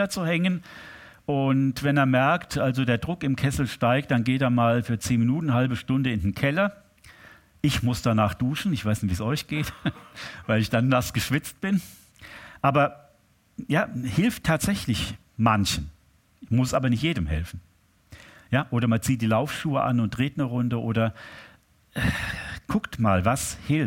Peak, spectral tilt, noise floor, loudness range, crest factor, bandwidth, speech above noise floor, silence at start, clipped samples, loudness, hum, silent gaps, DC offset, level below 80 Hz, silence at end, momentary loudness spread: -6 dBFS; -6 dB/octave; -61 dBFS; 3 LU; 20 dB; 17 kHz; 37 dB; 0 s; under 0.1%; -25 LUFS; none; none; under 0.1%; -44 dBFS; 0 s; 11 LU